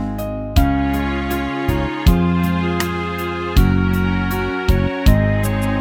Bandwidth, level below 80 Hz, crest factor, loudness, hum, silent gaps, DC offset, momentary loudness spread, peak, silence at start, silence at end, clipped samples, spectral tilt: 18.5 kHz; -22 dBFS; 16 dB; -18 LUFS; none; none; under 0.1%; 6 LU; 0 dBFS; 0 s; 0 s; under 0.1%; -6.5 dB/octave